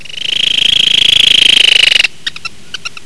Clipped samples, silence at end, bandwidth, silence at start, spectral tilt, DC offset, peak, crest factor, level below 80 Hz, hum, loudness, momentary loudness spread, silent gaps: 2%; 0.15 s; 11 kHz; 0.2 s; 1 dB/octave; 5%; 0 dBFS; 10 dB; -44 dBFS; none; -6 LUFS; 19 LU; none